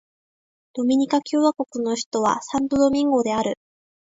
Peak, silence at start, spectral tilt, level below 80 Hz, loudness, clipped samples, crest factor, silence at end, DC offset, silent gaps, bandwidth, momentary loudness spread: -6 dBFS; 0.75 s; -4.5 dB/octave; -58 dBFS; -22 LUFS; under 0.1%; 16 dB; 0.6 s; under 0.1%; 2.06-2.11 s; 8 kHz; 7 LU